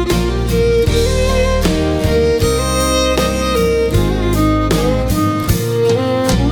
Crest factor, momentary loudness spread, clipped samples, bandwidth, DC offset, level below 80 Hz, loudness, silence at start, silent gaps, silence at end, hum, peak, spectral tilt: 12 dB; 2 LU; under 0.1%; 19.5 kHz; under 0.1%; -20 dBFS; -14 LUFS; 0 s; none; 0 s; none; 0 dBFS; -5.5 dB/octave